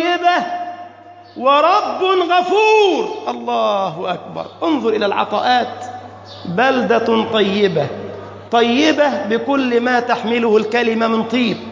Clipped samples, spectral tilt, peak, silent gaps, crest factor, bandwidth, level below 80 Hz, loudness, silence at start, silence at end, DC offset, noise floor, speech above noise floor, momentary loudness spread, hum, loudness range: under 0.1%; -5 dB/octave; -2 dBFS; none; 14 dB; 7.6 kHz; -60 dBFS; -16 LUFS; 0 s; 0 s; under 0.1%; -39 dBFS; 24 dB; 16 LU; none; 3 LU